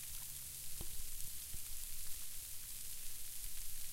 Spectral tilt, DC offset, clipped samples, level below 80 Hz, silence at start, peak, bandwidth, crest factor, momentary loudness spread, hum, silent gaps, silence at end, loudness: -0.5 dB/octave; under 0.1%; under 0.1%; -52 dBFS; 0 s; -24 dBFS; 16 kHz; 18 dB; 1 LU; none; none; 0 s; -46 LUFS